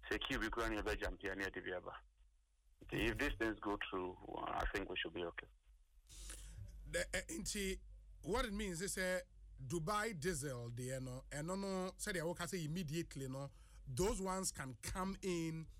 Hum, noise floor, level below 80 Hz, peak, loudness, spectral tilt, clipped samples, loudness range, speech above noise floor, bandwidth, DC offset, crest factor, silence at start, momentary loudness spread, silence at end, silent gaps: none; -73 dBFS; -54 dBFS; -24 dBFS; -43 LUFS; -4 dB/octave; under 0.1%; 3 LU; 30 dB; 16 kHz; under 0.1%; 20 dB; 0 s; 13 LU; 0 s; none